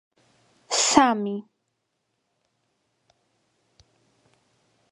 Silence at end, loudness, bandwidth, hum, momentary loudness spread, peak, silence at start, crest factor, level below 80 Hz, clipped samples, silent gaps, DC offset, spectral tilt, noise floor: 3.5 s; -21 LUFS; 11.5 kHz; none; 14 LU; 0 dBFS; 0.7 s; 28 dB; -66 dBFS; under 0.1%; none; under 0.1%; -2 dB/octave; -77 dBFS